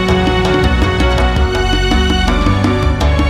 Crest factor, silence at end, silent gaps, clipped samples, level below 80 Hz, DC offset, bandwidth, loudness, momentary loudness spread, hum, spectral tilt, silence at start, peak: 12 dB; 0 s; none; under 0.1%; -16 dBFS; under 0.1%; 12.5 kHz; -13 LUFS; 1 LU; none; -6 dB/octave; 0 s; 0 dBFS